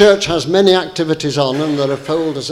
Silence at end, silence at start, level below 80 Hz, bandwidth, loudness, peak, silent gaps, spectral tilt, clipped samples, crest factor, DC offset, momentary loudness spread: 0 s; 0 s; -46 dBFS; 13.5 kHz; -15 LUFS; 0 dBFS; none; -5 dB/octave; under 0.1%; 14 dB; under 0.1%; 7 LU